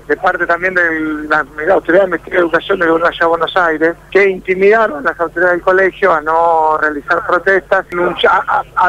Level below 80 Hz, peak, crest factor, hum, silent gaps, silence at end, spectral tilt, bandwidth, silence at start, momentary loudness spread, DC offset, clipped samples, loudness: -44 dBFS; -2 dBFS; 12 dB; none; none; 0 s; -5.5 dB/octave; 12 kHz; 0.1 s; 4 LU; under 0.1%; under 0.1%; -12 LUFS